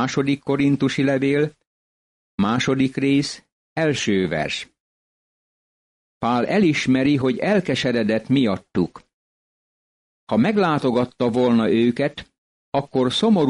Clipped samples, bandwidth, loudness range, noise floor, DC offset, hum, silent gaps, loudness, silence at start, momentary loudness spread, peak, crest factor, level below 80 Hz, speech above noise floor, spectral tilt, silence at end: under 0.1%; 11 kHz; 3 LU; under -90 dBFS; under 0.1%; none; 1.67-2.38 s, 3.52-3.76 s, 4.80-6.21 s, 9.13-10.27 s, 12.38-12.72 s; -20 LUFS; 0 s; 8 LU; -8 dBFS; 14 dB; -56 dBFS; over 71 dB; -6 dB/octave; 0 s